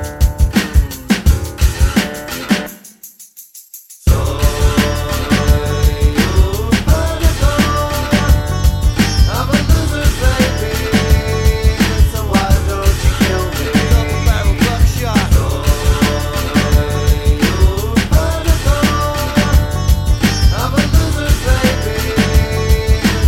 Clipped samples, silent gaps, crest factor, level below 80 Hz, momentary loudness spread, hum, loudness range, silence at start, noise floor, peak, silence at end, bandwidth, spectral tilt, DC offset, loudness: under 0.1%; none; 12 dB; -16 dBFS; 4 LU; none; 3 LU; 0 s; -38 dBFS; 0 dBFS; 0 s; 16.5 kHz; -5.5 dB/octave; under 0.1%; -14 LUFS